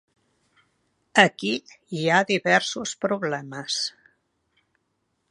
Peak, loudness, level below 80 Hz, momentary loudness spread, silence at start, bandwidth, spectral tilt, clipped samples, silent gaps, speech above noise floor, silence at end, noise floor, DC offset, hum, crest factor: 0 dBFS; -23 LUFS; -74 dBFS; 12 LU; 1.15 s; 11 kHz; -3.5 dB/octave; under 0.1%; none; 51 dB; 1.4 s; -74 dBFS; under 0.1%; none; 26 dB